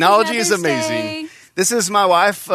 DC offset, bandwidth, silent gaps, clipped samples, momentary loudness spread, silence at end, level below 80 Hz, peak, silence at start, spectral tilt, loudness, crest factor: under 0.1%; 14 kHz; none; under 0.1%; 12 LU; 0 s; -64 dBFS; 0 dBFS; 0 s; -2.5 dB/octave; -16 LUFS; 16 dB